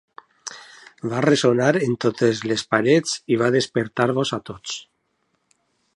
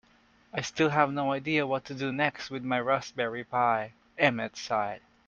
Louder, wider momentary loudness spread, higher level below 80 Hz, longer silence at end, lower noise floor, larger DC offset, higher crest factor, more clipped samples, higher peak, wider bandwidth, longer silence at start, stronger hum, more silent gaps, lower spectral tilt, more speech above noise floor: first, -21 LUFS vs -29 LUFS; first, 17 LU vs 9 LU; first, -62 dBFS vs -68 dBFS; first, 1.15 s vs 0.3 s; first, -70 dBFS vs -63 dBFS; neither; about the same, 20 dB vs 22 dB; neither; first, -2 dBFS vs -6 dBFS; first, 11.5 kHz vs 7.6 kHz; about the same, 0.45 s vs 0.55 s; neither; neither; about the same, -5 dB/octave vs -5 dB/octave; first, 50 dB vs 34 dB